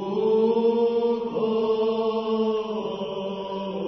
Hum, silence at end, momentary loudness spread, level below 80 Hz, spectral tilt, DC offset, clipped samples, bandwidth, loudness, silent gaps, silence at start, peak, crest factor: none; 0 s; 9 LU; -64 dBFS; -7.5 dB/octave; under 0.1%; under 0.1%; 6 kHz; -24 LUFS; none; 0 s; -10 dBFS; 12 dB